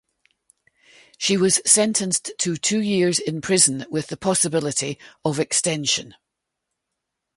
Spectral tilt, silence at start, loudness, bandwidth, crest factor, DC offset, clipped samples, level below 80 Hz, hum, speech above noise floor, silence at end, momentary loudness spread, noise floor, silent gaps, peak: -3 dB/octave; 1.2 s; -20 LUFS; 11.5 kHz; 22 dB; under 0.1%; under 0.1%; -62 dBFS; none; 59 dB; 1.25 s; 10 LU; -81 dBFS; none; -2 dBFS